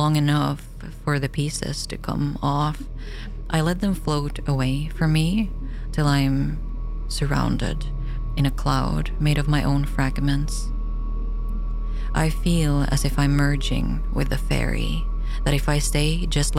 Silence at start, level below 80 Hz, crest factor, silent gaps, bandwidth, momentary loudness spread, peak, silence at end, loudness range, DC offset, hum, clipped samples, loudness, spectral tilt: 0 s; -26 dBFS; 16 dB; none; 15.5 kHz; 10 LU; -6 dBFS; 0 s; 2 LU; under 0.1%; none; under 0.1%; -24 LUFS; -5.5 dB/octave